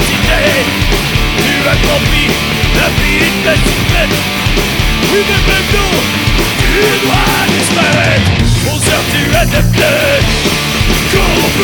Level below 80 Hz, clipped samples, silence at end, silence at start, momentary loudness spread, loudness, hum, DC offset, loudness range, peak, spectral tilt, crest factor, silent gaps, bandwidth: -18 dBFS; under 0.1%; 0 s; 0 s; 2 LU; -10 LUFS; none; under 0.1%; 1 LU; 0 dBFS; -4 dB/octave; 10 dB; none; over 20 kHz